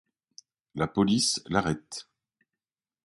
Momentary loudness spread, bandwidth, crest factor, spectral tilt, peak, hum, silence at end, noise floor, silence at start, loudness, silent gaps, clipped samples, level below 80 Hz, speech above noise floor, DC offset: 18 LU; 11.5 kHz; 22 dB; -4 dB/octave; -8 dBFS; none; 1.05 s; under -90 dBFS; 0.75 s; -27 LUFS; none; under 0.1%; -56 dBFS; over 63 dB; under 0.1%